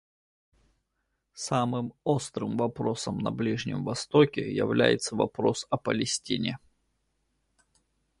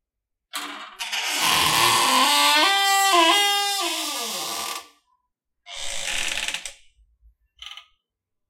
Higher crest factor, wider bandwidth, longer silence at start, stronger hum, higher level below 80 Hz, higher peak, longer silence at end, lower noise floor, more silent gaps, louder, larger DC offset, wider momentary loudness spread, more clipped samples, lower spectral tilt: about the same, 22 dB vs 20 dB; second, 11.5 kHz vs 16.5 kHz; first, 1.35 s vs 0.55 s; neither; second, -62 dBFS vs -54 dBFS; second, -8 dBFS vs -4 dBFS; first, 1.65 s vs 0.7 s; second, -79 dBFS vs -83 dBFS; neither; second, -28 LUFS vs -19 LUFS; neither; second, 8 LU vs 19 LU; neither; first, -5 dB/octave vs 0 dB/octave